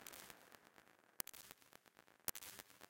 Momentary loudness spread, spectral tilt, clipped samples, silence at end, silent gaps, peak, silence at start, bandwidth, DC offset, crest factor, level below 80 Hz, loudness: 20 LU; -0.5 dB/octave; under 0.1%; 0 s; none; -16 dBFS; 0 s; 17 kHz; under 0.1%; 40 dB; -82 dBFS; -51 LUFS